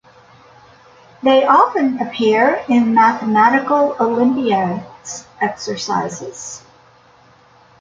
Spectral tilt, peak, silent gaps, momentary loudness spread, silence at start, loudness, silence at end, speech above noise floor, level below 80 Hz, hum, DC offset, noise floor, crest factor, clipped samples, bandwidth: -4.5 dB/octave; -2 dBFS; none; 17 LU; 1.25 s; -15 LUFS; 1.2 s; 34 dB; -60 dBFS; none; under 0.1%; -49 dBFS; 16 dB; under 0.1%; 7.6 kHz